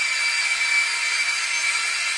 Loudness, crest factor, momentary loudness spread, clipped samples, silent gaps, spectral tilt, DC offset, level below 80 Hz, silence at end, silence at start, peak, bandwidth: -20 LUFS; 14 dB; 2 LU; under 0.1%; none; 4.5 dB/octave; under 0.1%; -74 dBFS; 0 s; 0 s; -10 dBFS; 11.5 kHz